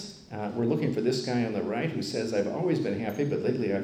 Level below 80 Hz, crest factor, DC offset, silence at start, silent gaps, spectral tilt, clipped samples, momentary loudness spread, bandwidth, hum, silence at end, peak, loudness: -66 dBFS; 14 dB; under 0.1%; 0 s; none; -6.5 dB/octave; under 0.1%; 4 LU; 15 kHz; none; 0 s; -14 dBFS; -29 LUFS